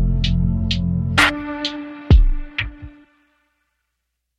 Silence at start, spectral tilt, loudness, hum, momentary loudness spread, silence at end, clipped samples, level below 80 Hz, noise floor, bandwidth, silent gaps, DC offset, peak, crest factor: 0 s; -5.5 dB/octave; -19 LUFS; none; 11 LU; 1.5 s; under 0.1%; -22 dBFS; -76 dBFS; 13.5 kHz; none; under 0.1%; -2 dBFS; 18 dB